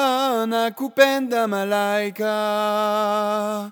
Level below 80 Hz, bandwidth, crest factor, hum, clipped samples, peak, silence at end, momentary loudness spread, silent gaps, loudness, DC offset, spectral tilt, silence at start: -74 dBFS; over 20 kHz; 20 dB; none; under 0.1%; 0 dBFS; 0 s; 6 LU; none; -21 LUFS; under 0.1%; -4 dB/octave; 0 s